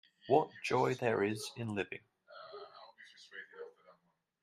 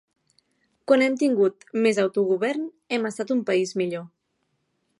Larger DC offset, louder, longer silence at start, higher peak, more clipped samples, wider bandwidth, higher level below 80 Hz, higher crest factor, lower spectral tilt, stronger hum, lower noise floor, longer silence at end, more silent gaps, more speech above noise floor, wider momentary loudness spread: neither; second, -35 LUFS vs -23 LUFS; second, 0.25 s vs 0.9 s; second, -14 dBFS vs -6 dBFS; neither; first, 13.5 kHz vs 11.5 kHz; about the same, -78 dBFS vs -78 dBFS; first, 24 dB vs 18 dB; about the same, -5.5 dB/octave vs -5 dB/octave; neither; about the same, -75 dBFS vs -74 dBFS; second, 0.5 s vs 0.95 s; neither; second, 41 dB vs 51 dB; first, 22 LU vs 9 LU